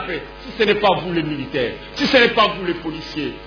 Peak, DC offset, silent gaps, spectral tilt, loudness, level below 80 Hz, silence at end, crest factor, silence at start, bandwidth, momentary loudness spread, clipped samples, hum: -2 dBFS; under 0.1%; none; -5.5 dB/octave; -19 LUFS; -44 dBFS; 0 s; 18 dB; 0 s; 5.4 kHz; 13 LU; under 0.1%; none